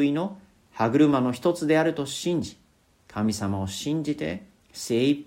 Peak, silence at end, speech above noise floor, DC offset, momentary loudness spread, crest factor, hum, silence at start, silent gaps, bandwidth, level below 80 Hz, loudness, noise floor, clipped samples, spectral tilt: -8 dBFS; 0.05 s; 33 dB; under 0.1%; 17 LU; 18 dB; none; 0 s; none; 16 kHz; -60 dBFS; -25 LUFS; -58 dBFS; under 0.1%; -5.5 dB/octave